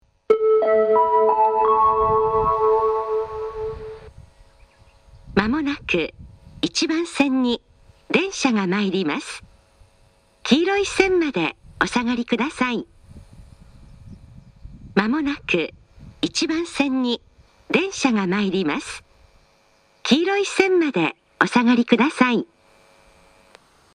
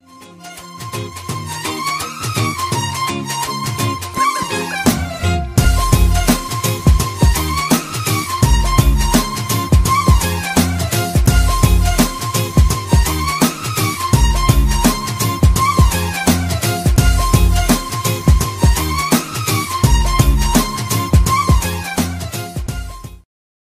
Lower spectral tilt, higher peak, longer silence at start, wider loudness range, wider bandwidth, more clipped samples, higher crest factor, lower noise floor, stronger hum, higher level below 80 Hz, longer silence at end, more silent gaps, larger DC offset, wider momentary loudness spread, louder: about the same, -4.5 dB/octave vs -4.5 dB/octave; about the same, 0 dBFS vs 0 dBFS; about the same, 0.3 s vs 0.2 s; first, 7 LU vs 4 LU; second, 11 kHz vs 16 kHz; neither; first, 20 dB vs 14 dB; first, -59 dBFS vs -37 dBFS; neither; second, -48 dBFS vs -18 dBFS; first, 1.5 s vs 0.6 s; neither; neither; first, 12 LU vs 8 LU; second, -20 LUFS vs -16 LUFS